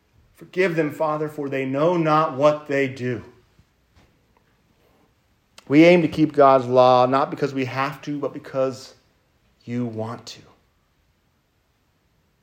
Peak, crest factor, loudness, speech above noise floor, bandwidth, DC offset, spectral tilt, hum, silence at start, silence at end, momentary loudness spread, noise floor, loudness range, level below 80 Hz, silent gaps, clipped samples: -2 dBFS; 20 dB; -20 LUFS; 46 dB; 16 kHz; under 0.1%; -7 dB/octave; none; 0.4 s; 2.1 s; 16 LU; -66 dBFS; 14 LU; -64 dBFS; none; under 0.1%